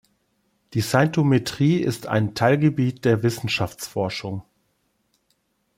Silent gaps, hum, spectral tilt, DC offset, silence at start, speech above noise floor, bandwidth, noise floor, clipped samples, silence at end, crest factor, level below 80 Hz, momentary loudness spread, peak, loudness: none; none; -6 dB/octave; under 0.1%; 0.7 s; 49 dB; 16.5 kHz; -70 dBFS; under 0.1%; 1.35 s; 18 dB; -58 dBFS; 9 LU; -4 dBFS; -22 LUFS